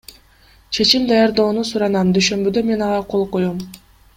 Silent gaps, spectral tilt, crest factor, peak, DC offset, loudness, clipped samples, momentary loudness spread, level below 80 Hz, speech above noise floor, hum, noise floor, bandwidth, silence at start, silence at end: none; -4.5 dB/octave; 18 dB; 0 dBFS; under 0.1%; -17 LUFS; under 0.1%; 9 LU; -48 dBFS; 34 dB; none; -50 dBFS; 16 kHz; 0.7 s; 0.4 s